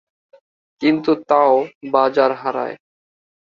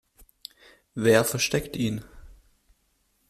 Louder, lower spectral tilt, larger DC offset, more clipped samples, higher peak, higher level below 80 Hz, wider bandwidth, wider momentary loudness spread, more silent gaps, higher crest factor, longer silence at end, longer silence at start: first, -17 LUFS vs -24 LUFS; first, -7 dB/octave vs -4 dB/octave; neither; neither; first, 0 dBFS vs -8 dBFS; second, -64 dBFS vs -54 dBFS; second, 7 kHz vs 15.5 kHz; second, 11 LU vs 24 LU; first, 1.75-1.81 s vs none; about the same, 18 dB vs 22 dB; second, 0.65 s vs 0.95 s; second, 0.8 s vs 0.95 s